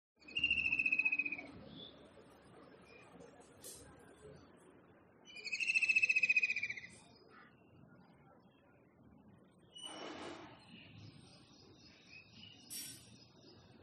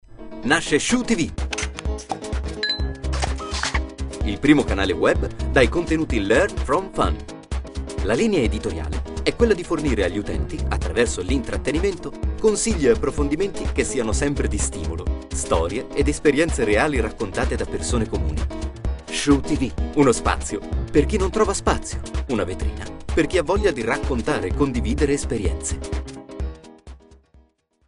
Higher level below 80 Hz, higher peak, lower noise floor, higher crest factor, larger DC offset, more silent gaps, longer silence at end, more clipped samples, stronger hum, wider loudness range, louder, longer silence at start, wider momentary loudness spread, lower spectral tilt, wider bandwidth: second, -74 dBFS vs -28 dBFS; second, -20 dBFS vs -2 dBFS; first, -67 dBFS vs -58 dBFS; about the same, 22 dB vs 20 dB; neither; neither; second, 0.05 s vs 0.9 s; neither; neither; first, 21 LU vs 3 LU; second, -35 LUFS vs -22 LUFS; first, 0.25 s vs 0.1 s; first, 29 LU vs 10 LU; second, -1.5 dB/octave vs -5 dB/octave; about the same, 11.5 kHz vs 11.5 kHz